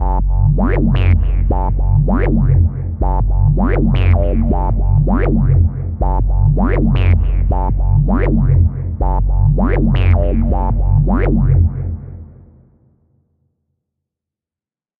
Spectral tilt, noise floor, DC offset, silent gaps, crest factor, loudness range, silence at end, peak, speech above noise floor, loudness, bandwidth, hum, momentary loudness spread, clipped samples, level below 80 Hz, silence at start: -11.5 dB/octave; under -90 dBFS; under 0.1%; none; 12 dB; 4 LU; 2.75 s; 0 dBFS; over 79 dB; -15 LUFS; 3.6 kHz; none; 5 LU; under 0.1%; -16 dBFS; 0 s